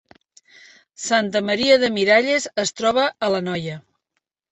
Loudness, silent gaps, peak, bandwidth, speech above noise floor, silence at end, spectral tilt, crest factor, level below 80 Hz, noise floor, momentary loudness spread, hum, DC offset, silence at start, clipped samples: -19 LUFS; none; -2 dBFS; 8.4 kHz; 58 dB; 0.7 s; -3.5 dB/octave; 18 dB; -60 dBFS; -77 dBFS; 12 LU; none; under 0.1%; 1 s; under 0.1%